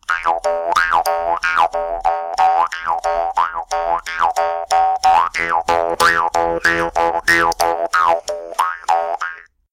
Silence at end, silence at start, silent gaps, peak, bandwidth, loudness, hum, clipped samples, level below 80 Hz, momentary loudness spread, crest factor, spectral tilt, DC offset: 0.3 s; 0.1 s; none; -4 dBFS; 17 kHz; -17 LUFS; none; under 0.1%; -44 dBFS; 6 LU; 14 dB; -2 dB/octave; under 0.1%